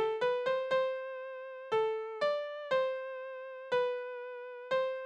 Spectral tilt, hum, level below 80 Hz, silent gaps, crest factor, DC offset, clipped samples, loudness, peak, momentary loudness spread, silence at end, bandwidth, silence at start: -3.5 dB/octave; none; -80 dBFS; none; 14 dB; under 0.1%; under 0.1%; -35 LUFS; -20 dBFS; 12 LU; 0 s; 8.2 kHz; 0 s